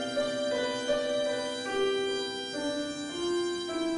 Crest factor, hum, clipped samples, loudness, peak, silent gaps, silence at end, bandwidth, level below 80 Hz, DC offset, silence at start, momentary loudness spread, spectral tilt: 14 dB; none; under 0.1%; -31 LUFS; -16 dBFS; none; 0 s; 11.5 kHz; -64 dBFS; under 0.1%; 0 s; 5 LU; -3 dB/octave